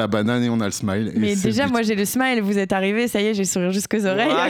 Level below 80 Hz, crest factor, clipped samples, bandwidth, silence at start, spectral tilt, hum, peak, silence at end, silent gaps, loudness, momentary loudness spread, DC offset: -54 dBFS; 14 dB; under 0.1%; 18.5 kHz; 0 s; -4.5 dB/octave; none; -6 dBFS; 0 s; none; -20 LUFS; 2 LU; under 0.1%